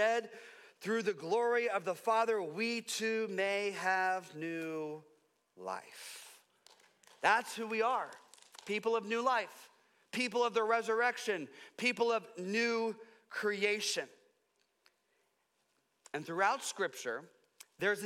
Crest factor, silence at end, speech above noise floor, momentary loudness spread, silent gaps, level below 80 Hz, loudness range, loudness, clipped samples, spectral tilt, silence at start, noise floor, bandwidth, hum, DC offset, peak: 20 dB; 0 s; 44 dB; 16 LU; none; under -90 dBFS; 6 LU; -35 LUFS; under 0.1%; -3 dB/octave; 0 s; -79 dBFS; 16 kHz; none; under 0.1%; -16 dBFS